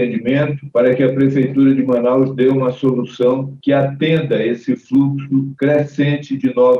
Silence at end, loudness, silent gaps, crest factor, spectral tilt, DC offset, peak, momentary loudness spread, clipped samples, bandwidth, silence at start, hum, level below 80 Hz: 0 s; -16 LUFS; none; 12 dB; -9 dB/octave; under 0.1%; -4 dBFS; 5 LU; under 0.1%; 6.8 kHz; 0 s; none; -58 dBFS